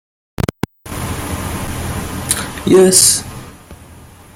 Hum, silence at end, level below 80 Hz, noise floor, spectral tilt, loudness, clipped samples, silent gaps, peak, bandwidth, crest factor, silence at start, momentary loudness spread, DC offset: none; 0.3 s; -36 dBFS; -39 dBFS; -3.5 dB/octave; -14 LUFS; under 0.1%; none; 0 dBFS; 17 kHz; 16 dB; 0.4 s; 19 LU; under 0.1%